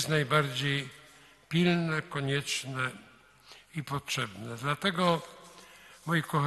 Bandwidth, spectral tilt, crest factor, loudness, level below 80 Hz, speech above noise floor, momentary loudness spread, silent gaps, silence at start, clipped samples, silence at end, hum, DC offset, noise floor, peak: 12.5 kHz; -5 dB/octave; 20 dB; -30 LUFS; -66 dBFS; 27 dB; 20 LU; none; 0 s; under 0.1%; 0 s; none; under 0.1%; -57 dBFS; -12 dBFS